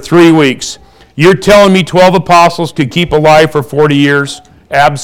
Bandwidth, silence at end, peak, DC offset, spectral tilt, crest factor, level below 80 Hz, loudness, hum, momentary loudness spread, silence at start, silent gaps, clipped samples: 18.5 kHz; 0 s; 0 dBFS; under 0.1%; -5.5 dB/octave; 8 dB; -36 dBFS; -7 LUFS; none; 12 LU; 0 s; none; 0.3%